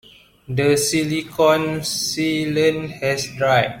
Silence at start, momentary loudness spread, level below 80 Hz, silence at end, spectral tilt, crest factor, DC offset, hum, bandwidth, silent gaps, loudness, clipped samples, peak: 0.5 s; 6 LU; -52 dBFS; 0 s; -4 dB/octave; 16 dB; under 0.1%; none; 16.5 kHz; none; -19 LUFS; under 0.1%; -4 dBFS